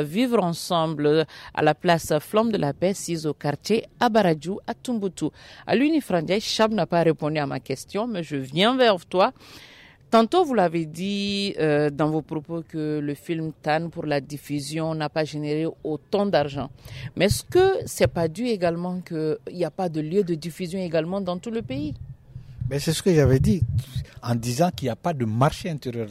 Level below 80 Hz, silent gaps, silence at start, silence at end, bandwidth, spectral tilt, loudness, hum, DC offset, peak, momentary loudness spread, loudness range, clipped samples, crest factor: -48 dBFS; none; 0 s; 0 s; 16 kHz; -5.5 dB/octave; -24 LUFS; none; under 0.1%; -6 dBFS; 11 LU; 5 LU; under 0.1%; 16 dB